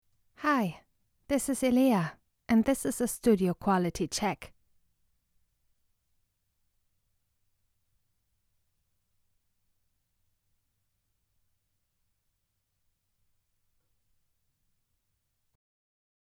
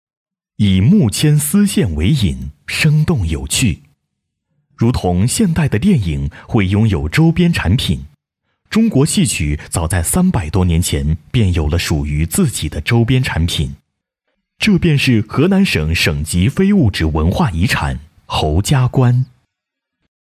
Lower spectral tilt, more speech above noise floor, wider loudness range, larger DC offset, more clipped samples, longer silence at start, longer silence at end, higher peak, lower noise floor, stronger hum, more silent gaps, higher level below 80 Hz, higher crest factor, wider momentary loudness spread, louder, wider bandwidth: about the same, -5 dB/octave vs -5.5 dB/octave; second, 52 dB vs 65 dB; first, 11 LU vs 3 LU; neither; neither; second, 0.4 s vs 0.6 s; first, 11.95 s vs 1 s; second, -12 dBFS vs -4 dBFS; about the same, -80 dBFS vs -78 dBFS; neither; neither; second, -60 dBFS vs -26 dBFS; first, 22 dB vs 12 dB; about the same, 8 LU vs 7 LU; second, -29 LUFS vs -15 LUFS; about the same, 16.5 kHz vs 16 kHz